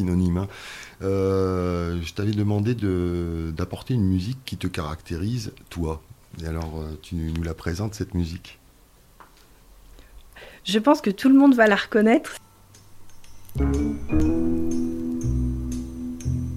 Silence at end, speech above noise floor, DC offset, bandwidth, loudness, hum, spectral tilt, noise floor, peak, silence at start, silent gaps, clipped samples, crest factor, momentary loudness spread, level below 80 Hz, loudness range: 0 s; 31 dB; under 0.1%; 15.5 kHz; -24 LUFS; none; -7 dB/octave; -54 dBFS; -4 dBFS; 0 s; none; under 0.1%; 20 dB; 15 LU; -36 dBFS; 11 LU